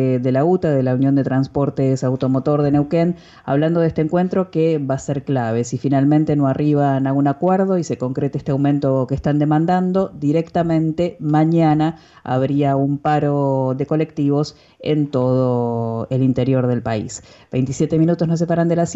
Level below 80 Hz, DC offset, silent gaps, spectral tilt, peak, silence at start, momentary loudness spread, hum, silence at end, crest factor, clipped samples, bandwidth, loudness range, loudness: -48 dBFS; under 0.1%; none; -8 dB/octave; -6 dBFS; 0 s; 6 LU; none; 0 s; 12 dB; under 0.1%; 8 kHz; 2 LU; -18 LUFS